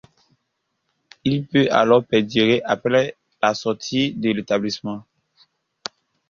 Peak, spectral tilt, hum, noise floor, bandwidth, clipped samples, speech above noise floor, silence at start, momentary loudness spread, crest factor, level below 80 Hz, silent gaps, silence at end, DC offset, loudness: -2 dBFS; -5.5 dB/octave; none; -75 dBFS; 7.4 kHz; under 0.1%; 55 dB; 1.25 s; 17 LU; 18 dB; -58 dBFS; none; 1.3 s; under 0.1%; -20 LUFS